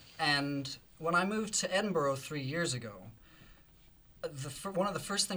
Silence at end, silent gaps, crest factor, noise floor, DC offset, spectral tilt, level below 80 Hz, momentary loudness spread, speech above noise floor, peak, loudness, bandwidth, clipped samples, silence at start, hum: 0 s; none; 20 dB; -61 dBFS; under 0.1%; -3.5 dB/octave; -64 dBFS; 13 LU; 27 dB; -16 dBFS; -34 LUFS; over 20 kHz; under 0.1%; 0 s; none